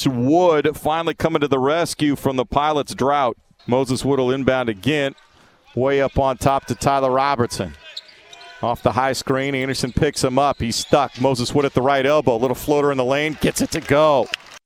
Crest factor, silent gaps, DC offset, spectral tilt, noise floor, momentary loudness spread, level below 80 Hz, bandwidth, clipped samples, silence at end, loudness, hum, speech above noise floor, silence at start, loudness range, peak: 20 dB; none; under 0.1%; -5 dB/octave; -52 dBFS; 6 LU; -42 dBFS; 19 kHz; under 0.1%; 0.05 s; -19 LUFS; none; 33 dB; 0 s; 3 LU; 0 dBFS